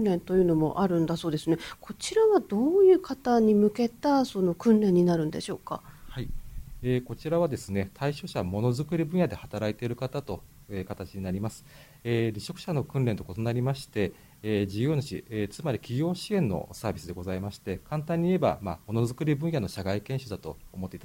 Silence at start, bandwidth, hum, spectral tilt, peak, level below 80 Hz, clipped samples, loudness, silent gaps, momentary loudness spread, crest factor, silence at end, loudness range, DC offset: 0 s; 16.5 kHz; none; -7 dB/octave; -10 dBFS; -50 dBFS; under 0.1%; -28 LUFS; none; 16 LU; 16 dB; 0 s; 8 LU; under 0.1%